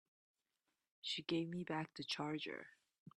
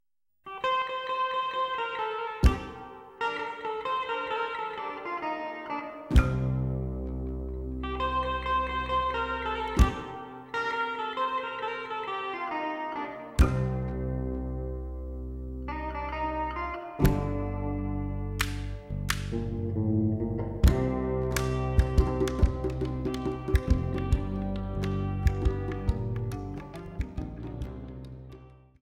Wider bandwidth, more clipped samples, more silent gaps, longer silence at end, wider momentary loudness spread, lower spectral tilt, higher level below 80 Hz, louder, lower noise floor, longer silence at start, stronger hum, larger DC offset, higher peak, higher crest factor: second, 11 kHz vs 16 kHz; neither; first, 2.99-3.06 s vs none; second, 0.1 s vs 0.25 s; second, 9 LU vs 12 LU; second, -5 dB/octave vs -6.5 dB/octave; second, -84 dBFS vs -34 dBFS; second, -44 LUFS vs -31 LUFS; first, -90 dBFS vs -51 dBFS; first, 1.05 s vs 0.45 s; neither; neither; second, -26 dBFS vs -6 dBFS; about the same, 22 dB vs 22 dB